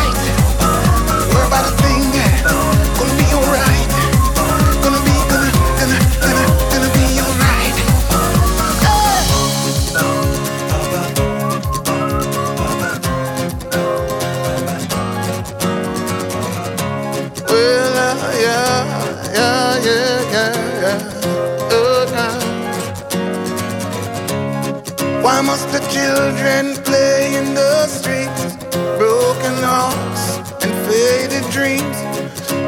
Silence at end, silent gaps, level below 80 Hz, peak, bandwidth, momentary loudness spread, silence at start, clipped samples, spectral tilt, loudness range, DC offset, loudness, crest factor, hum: 0 s; none; -24 dBFS; 0 dBFS; 19 kHz; 8 LU; 0 s; under 0.1%; -4.5 dB/octave; 6 LU; under 0.1%; -15 LUFS; 14 dB; none